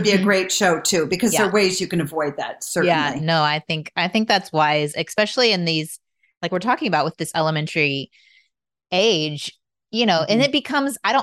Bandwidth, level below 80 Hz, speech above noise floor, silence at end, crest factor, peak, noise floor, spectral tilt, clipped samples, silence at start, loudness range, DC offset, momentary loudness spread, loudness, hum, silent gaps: 16 kHz; -62 dBFS; 52 dB; 0 s; 16 dB; -6 dBFS; -71 dBFS; -3.5 dB/octave; under 0.1%; 0 s; 3 LU; under 0.1%; 9 LU; -20 LUFS; none; 6.37-6.41 s